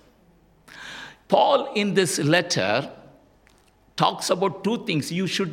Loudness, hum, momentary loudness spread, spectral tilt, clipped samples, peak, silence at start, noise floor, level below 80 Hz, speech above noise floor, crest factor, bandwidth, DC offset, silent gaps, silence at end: -22 LUFS; none; 18 LU; -4 dB/octave; under 0.1%; -4 dBFS; 0.7 s; -58 dBFS; -64 dBFS; 36 dB; 20 dB; 16.5 kHz; under 0.1%; none; 0 s